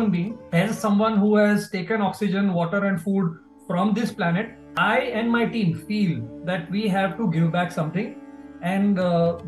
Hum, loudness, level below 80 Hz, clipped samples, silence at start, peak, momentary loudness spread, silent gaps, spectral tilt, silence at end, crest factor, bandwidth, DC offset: none; -23 LUFS; -58 dBFS; under 0.1%; 0 s; -8 dBFS; 9 LU; none; -7 dB/octave; 0 s; 14 dB; 12.5 kHz; under 0.1%